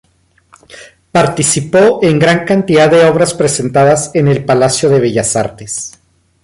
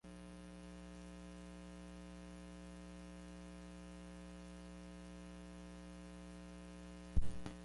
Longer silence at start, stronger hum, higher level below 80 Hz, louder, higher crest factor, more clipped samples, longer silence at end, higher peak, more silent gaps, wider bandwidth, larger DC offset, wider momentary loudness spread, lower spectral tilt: first, 0.75 s vs 0.05 s; second, none vs 60 Hz at -55 dBFS; first, -46 dBFS vs -54 dBFS; first, -11 LUFS vs -53 LUFS; second, 12 dB vs 24 dB; neither; first, 0.55 s vs 0 s; first, 0 dBFS vs -22 dBFS; neither; about the same, 11.5 kHz vs 11.5 kHz; neither; about the same, 8 LU vs 6 LU; second, -4.5 dB/octave vs -6 dB/octave